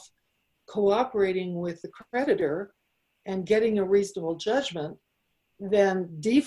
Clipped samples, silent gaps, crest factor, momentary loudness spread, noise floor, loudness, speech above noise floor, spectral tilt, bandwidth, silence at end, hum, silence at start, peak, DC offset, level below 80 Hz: under 0.1%; none; 18 dB; 13 LU; -75 dBFS; -27 LUFS; 49 dB; -5.5 dB/octave; 11.5 kHz; 0 s; none; 0.7 s; -10 dBFS; under 0.1%; -64 dBFS